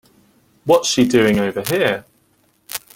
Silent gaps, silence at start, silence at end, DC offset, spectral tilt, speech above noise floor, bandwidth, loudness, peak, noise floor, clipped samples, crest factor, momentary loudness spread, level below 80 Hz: none; 0.65 s; 0.2 s; under 0.1%; -4 dB/octave; 44 dB; 17 kHz; -16 LUFS; -2 dBFS; -60 dBFS; under 0.1%; 18 dB; 15 LU; -52 dBFS